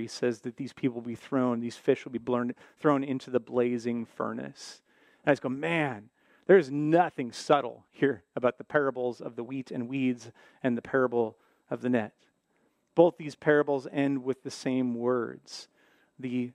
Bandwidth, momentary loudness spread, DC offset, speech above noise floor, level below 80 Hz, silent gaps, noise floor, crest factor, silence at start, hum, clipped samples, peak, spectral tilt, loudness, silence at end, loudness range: 11 kHz; 14 LU; under 0.1%; 43 dB; -76 dBFS; none; -72 dBFS; 22 dB; 0 s; none; under 0.1%; -8 dBFS; -6.5 dB/octave; -29 LUFS; 0.05 s; 4 LU